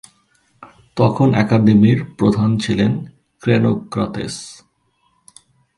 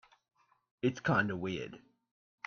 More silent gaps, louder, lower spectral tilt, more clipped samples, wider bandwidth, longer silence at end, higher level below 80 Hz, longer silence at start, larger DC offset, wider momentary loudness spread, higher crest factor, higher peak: neither; first, -16 LUFS vs -34 LUFS; about the same, -7.5 dB/octave vs -6.5 dB/octave; neither; first, 11.5 kHz vs 7 kHz; first, 1.25 s vs 0.7 s; first, -48 dBFS vs -70 dBFS; second, 0.6 s vs 0.85 s; neither; first, 15 LU vs 11 LU; about the same, 18 dB vs 20 dB; first, 0 dBFS vs -16 dBFS